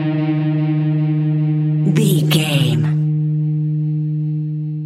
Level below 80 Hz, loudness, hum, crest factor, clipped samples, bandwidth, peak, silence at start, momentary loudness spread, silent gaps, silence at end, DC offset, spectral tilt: -62 dBFS; -17 LUFS; none; 14 dB; under 0.1%; 14 kHz; -2 dBFS; 0 s; 6 LU; none; 0 s; under 0.1%; -6.5 dB/octave